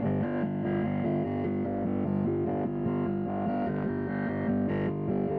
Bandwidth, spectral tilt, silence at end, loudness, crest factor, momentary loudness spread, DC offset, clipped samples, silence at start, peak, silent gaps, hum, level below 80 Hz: 4.6 kHz; -11.5 dB/octave; 0 s; -30 LUFS; 12 dB; 2 LU; under 0.1%; under 0.1%; 0 s; -18 dBFS; none; none; -56 dBFS